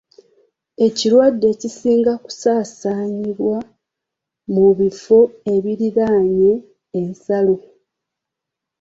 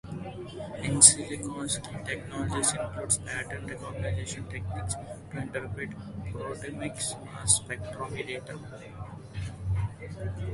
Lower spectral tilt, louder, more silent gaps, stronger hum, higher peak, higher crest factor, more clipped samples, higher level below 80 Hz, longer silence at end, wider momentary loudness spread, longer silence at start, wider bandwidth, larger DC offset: first, -6 dB/octave vs -3 dB/octave; first, -17 LUFS vs -28 LUFS; neither; neither; about the same, -2 dBFS vs -2 dBFS; second, 16 dB vs 30 dB; neither; second, -58 dBFS vs -48 dBFS; first, 1.2 s vs 0 s; second, 11 LU vs 15 LU; first, 0.8 s vs 0.05 s; second, 7.8 kHz vs 11.5 kHz; neither